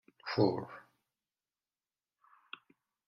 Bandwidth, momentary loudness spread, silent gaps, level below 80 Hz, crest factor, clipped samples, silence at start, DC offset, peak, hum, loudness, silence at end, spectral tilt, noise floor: 6 kHz; 20 LU; none; -78 dBFS; 24 dB; under 0.1%; 0.25 s; under 0.1%; -16 dBFS; none; -34 LUFS; 2.25 s; -8 dB/octave; under -90 dBFS